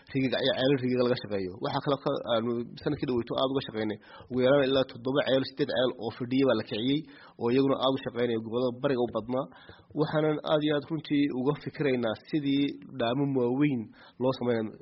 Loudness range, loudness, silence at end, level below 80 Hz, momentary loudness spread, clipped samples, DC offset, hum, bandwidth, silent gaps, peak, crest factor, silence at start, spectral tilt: 2 LU; -29 LUFS; 0.05 s; -64 dBFS; 8 LU; under 0.1%; under 0.1%; none; 5.8 kHz; none; -12 dBFS; 16 dB; 0.1 s; -5 dB/octave